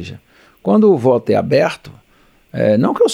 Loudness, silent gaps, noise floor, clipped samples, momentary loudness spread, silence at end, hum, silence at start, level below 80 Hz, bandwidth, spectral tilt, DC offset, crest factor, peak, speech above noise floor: -14 LUFS; none; -52 dBFS; under 0.1%; 18 LU; 0 s; none; 0 s; -56 dBFS; 11 kHz; -6.5 dB/octave; under 0.1%; 14 dB; -2 dBFS; 38 dB